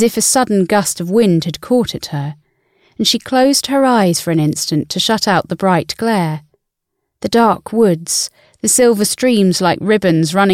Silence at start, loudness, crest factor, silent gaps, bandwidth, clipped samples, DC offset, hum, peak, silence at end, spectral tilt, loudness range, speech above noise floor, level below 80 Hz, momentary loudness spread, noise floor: 0 s; -14 LUFS; 12 dB; none; 16.5 kHz; under 0.1%; under 0.1%; none; -2 dBFS; 0 s; -4 dB/octave; 3 LU; 60 dB; -52 dBFS; 7 LU; -74 dBFS